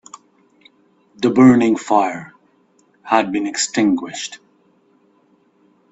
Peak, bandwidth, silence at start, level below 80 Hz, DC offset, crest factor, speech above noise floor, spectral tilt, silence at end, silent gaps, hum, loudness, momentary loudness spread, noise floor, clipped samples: 0 dBFS; 8.2 kHz; 1.2 s; -60 dBFS; under 0.1%; 18 dB; 42 dB; -4.5 dB/octave; 1.55 s; none; none; -16 LUFS; 17 LU; -57 dBFS; under 0.1%